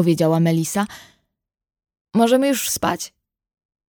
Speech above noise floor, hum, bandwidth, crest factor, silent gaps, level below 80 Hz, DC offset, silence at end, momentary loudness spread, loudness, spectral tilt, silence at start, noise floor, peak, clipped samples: 59 dB; none; over 20 kHz; 18 dB; 2.01-2.05 s; -58 dBFS; under 0.1%; 0.85 s; 12 LU; -19 LUFS; -5 dB/octave; 0 s; -77 dBFS; -4 dBFS; under 0.1%